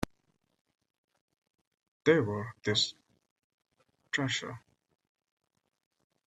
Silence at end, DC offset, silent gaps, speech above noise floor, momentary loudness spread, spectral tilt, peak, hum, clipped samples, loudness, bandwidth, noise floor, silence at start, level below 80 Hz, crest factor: 1.7 s; under 0.1%; 3.31-3.36 s, 3.44-3.58 s; 45 dB; 15 LU; -4 dB/octave; -10 dBFS; none; under 0.1%; -31 LUFS; 13.5 kHz; -76 dBFS; 2.05 s; -64 dBFS; 26 dB